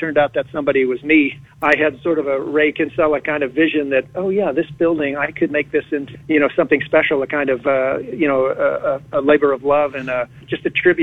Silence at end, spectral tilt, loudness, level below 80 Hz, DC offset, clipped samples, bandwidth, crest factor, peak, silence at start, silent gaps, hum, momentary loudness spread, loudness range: 0 s; -7.5 dB/octave; -18 LUFS; -52 dBFS; under 0.1%; under 0.1%; 7.2 kHz; 16 dB; -2 dBFS; 0 s; none; none; 6 LU; 1 LU